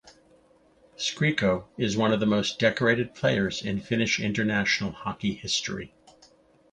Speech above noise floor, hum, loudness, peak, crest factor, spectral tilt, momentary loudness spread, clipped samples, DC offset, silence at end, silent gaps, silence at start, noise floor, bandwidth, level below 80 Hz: 34 dB; none; -26 LUFS; -8 dBFS; 20 dB; -4.5 dB/octave; 8 LU; under 0.1%; under 0.1%; 0.85 s; none; 0.05 s; -60 dBFS; 9.6 kHz; -56 dBFS